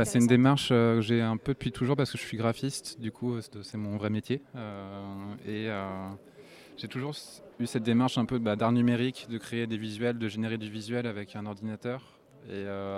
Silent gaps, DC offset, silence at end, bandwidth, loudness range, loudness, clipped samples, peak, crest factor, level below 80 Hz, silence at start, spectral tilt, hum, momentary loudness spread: none; under 0.1%; 0 s; 14.5 kHz; 8 LU; -30 LUFS; under 0.1%; -10 dBFS; 20 dB; -62 dBFS; 0 s; -6 dB/octave; none; 16 LU